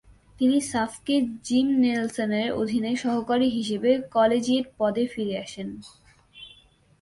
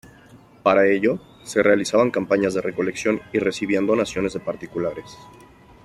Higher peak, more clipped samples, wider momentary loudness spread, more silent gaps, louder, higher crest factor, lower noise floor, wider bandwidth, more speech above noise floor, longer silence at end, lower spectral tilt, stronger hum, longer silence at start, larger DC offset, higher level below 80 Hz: second, -8 dBFS vs -4 dBFS; neither; first, 14 LU vs 10 LU; neither; second, -25 LUFS vs -21 LUFS; about the same, 16 dB vs 18 dB; first, -57 dBFS vs -49 dBFS; second, 11.5 kHz vs 13 kHz; first, 33 dB vs 28 dB; about the same, 0.55 s vs 0.6 s; about the same, -5 dB/octave vs -5 dB/octave; neither; about the same, 0.4 s vs 0.35 s; neither; about the same, -60 dBFS vs -56 dBFS